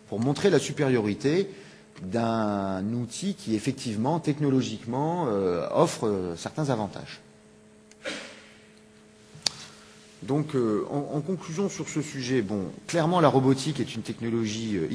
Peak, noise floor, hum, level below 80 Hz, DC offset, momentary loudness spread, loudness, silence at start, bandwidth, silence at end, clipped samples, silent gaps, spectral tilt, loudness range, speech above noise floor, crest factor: 0 dBFS; -54 dBFS; none; -64 dBFS; under 0.1%; 12 LU; -27 LUFS; 0.05 s; 11 kHz; 0 s; under 0.1%; none; -5.5 dB/octave; 8 LU; 27 dB; 26 dB